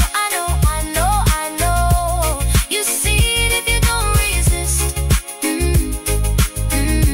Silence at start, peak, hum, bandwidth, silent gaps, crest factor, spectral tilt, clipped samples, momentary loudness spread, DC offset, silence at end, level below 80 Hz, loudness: 0 s; -4 dBFS; none; 16.5 kHz; none; 12 dB; -3.5 dB/octave; under 0.1%; 4 LU; 0.1%; 0 s; -20 dBFS; -17 LUFS